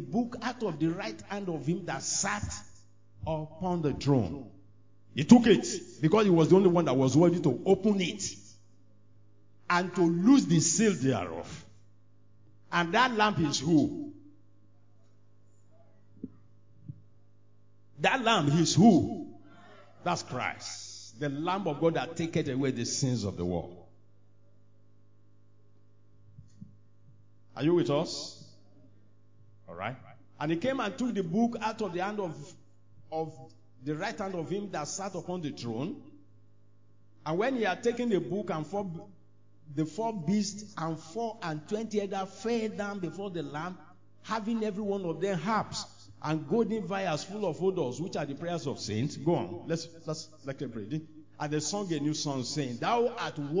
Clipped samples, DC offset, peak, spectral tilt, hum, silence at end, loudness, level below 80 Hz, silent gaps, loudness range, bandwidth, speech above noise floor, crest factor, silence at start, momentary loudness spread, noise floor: under 0.1%; 0.2%; -4 dBFS; -5 dB/octave; none; 0 s; -30 LUFS; -60 dBFS; none; 10 LU; 7.6 kHz; 34 dB; 26 dB; 0 s; 16 LU; -63 dBFS